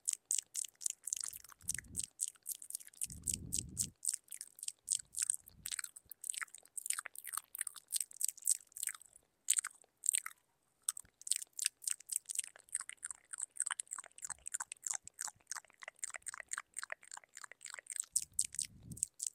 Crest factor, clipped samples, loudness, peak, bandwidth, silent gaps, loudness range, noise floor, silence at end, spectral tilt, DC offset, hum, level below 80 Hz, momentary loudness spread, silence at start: 34 dB; under 0.1%; -40 LUFS; -10 dBFS; 16.5 kHz; none; 5 LU; -78 dBFS; 0.05 s; 1 dB/octave; under 0.1%; none; -70 dBFS; 12 LU; 0.05 s